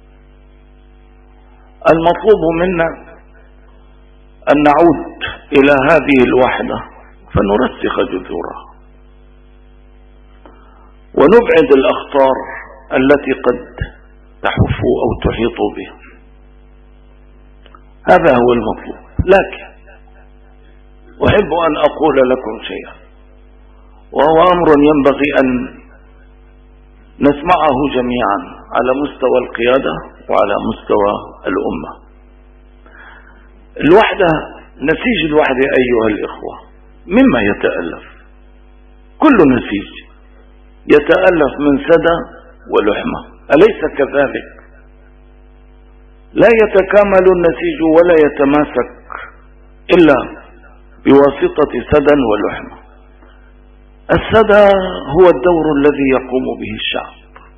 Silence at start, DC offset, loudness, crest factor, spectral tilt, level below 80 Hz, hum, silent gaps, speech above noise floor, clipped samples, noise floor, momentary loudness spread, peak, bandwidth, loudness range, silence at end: 1.85 s; under 0.1%; -12 LUFS; 14 dB; -8 dB/octave; -36 dBFS; 50 Hz at -40 dBFS; none; 30 dB; 0.2%; -42 dBFS; 15 LU; 0 dBFS; 7.2 kHz; 6 LU; 0.45 s